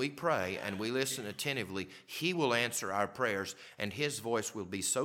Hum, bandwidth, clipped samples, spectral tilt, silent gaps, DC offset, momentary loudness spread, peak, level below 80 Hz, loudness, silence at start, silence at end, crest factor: none; 18.5 kHz; under 0.1%; -3 dB/octave; none; under 0.1%; 9 LU; -14 dBFS; -74 dBFS; -35 LUFS; 0 s; 0 s; 20 dB